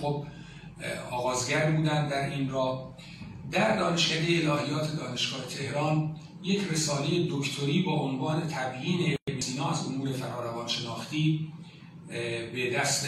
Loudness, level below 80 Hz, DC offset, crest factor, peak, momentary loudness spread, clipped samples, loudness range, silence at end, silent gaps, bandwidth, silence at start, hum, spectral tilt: -29 LUFS; -60 dBFS; under 0.1%; 16 dB; -12 dBFS; 13 LU; under 0.1%; 3 LU; 0 s; 9.22-9.26 s; 13.5 kHz; 0 s; none; -4.5 dB/octave